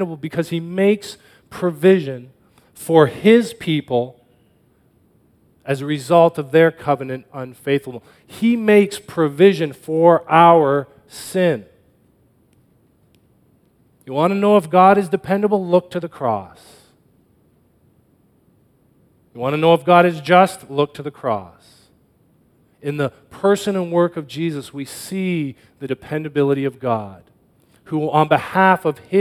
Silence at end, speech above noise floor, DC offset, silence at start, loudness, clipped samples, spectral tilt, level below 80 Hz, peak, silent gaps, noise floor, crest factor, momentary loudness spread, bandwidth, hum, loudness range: 0 s; 40 dB; under 0.1%; 0 s; -17 LUFS; under 0.1%; -6.5 dB/octave; -62 dBFS; 0 dBFS; none; -57 dBFS; 18 dB; 16 LU; 15 kHz; none; 8 LU